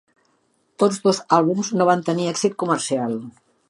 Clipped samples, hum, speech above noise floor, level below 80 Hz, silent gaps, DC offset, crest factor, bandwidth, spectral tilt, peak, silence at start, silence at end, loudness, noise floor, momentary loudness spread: under 0.1%; none; 45 dB; -72 dBFS; none; under 0.1%; 18 dB; 11.5 kHz; -5 dB/octave; -4 dBFS; 0.8 s; 0.4 s; -20 LUFS; -65 dBFS; 7 LU